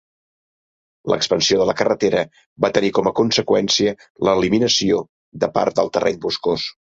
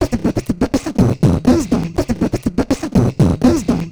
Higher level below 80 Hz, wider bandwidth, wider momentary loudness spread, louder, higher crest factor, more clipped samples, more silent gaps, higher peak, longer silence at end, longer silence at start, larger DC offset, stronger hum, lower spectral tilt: second, -52 dBFS vs -30 dBFS; second, 7.8 kHz vs over 20 kHz; about the same, 7 LU vs 6 LU; about the same, -18 LUFS vs -16 LUFS; about the same, 18 dB vs 14 dB; neither; first, 2.46-2.56 s, 4.10-4.15 s, 5.09-5.32 s vs none; about the same, 0 dBFS vs 0 dBFS; first, 0.2 s vs 0 s; first, 1.05 s vs 0 s; neither; neither; second, -4 dB/octave vs -7 dB/octave